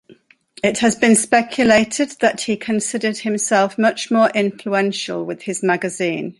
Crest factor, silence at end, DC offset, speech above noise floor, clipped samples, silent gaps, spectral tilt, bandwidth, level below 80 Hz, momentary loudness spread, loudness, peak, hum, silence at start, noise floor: 18 dB; 0.1 s; under 0.1%; 32 dB; under 0.1%; none; -3.5 dB/octave; 11.5 kHz; -58 dBFS; 8 LU; -18 LUFS; 0 dBFS; none; 0.1 s; -50 dBFS